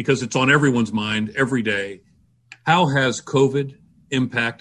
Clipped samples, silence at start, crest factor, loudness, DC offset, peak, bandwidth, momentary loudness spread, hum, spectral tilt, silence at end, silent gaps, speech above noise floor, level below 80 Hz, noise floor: under 0.1%; 0 s; 16 dB; -20 LUFS; under 0.1%; -4 dBFS; 11 kHz; 10 LU; none; -5 dB/octave; 0.05 s; none; 30 dB; -56 dBFS; -49 dBFS